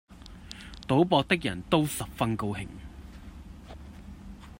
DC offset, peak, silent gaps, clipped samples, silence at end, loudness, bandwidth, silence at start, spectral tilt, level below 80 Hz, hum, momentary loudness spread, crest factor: under 0.1%; -8 dBFS; none; under 0.1%; 0.05 s; -27 LUFS; 16 kHz; 0.1 s; -5.5 dB/octave; -48 dBFS; none; 23 LU; 22 dB